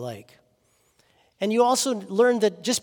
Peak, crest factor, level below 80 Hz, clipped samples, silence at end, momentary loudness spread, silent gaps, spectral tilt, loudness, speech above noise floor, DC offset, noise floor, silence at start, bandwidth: -8 dBFS; 18 dB; -76 dBFS; under 0.1%; 0 s; 13 LU; none; -3 dB/octave; -22 LUFS; 43 dB; under 0.1%; -66 dBFS; 0 s; 18 kHz